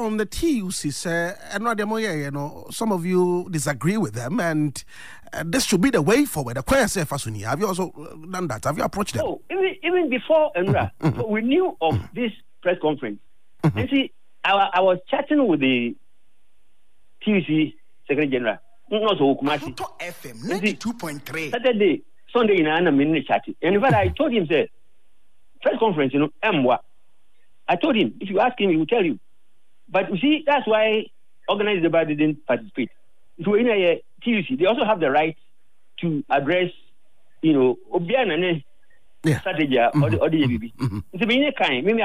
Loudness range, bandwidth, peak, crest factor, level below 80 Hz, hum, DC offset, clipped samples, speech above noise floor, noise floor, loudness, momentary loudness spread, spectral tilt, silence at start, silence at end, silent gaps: 3 LU; 15.5 kHz; -8 dBFS; 14 dB; -50 dBFS; none; 0.8%; under 0.1%; 50 dB; -71 dBFS; -22 LUFS; 10 LU; -5.5 dB/octave; 0 s; 0 s; none